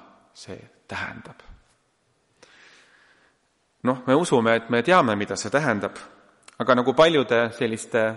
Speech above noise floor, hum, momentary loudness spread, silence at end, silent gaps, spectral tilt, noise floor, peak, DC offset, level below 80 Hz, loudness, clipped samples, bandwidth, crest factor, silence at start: 46 dB; none; 23 LU; 0 s; none; -5 dB/octave; -68 dBFS; -4 dBFS; under 0.1%; -62 dBFS; -22 LUFS; under 0.1%; 11.5 kHz; 20 dB; 0.4 s